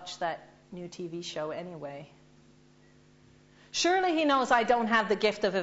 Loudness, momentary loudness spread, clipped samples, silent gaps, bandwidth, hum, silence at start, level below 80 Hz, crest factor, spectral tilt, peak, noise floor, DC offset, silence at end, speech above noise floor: -28 LUFS; 18 LU; under 0.1%; none; 8 kHz; none; 0 s; -66 dBFS; 20 dB; -3.5 dB/octave; -10 dBFS; -59 dBFS; under 0.1%; 0 s; 31 dB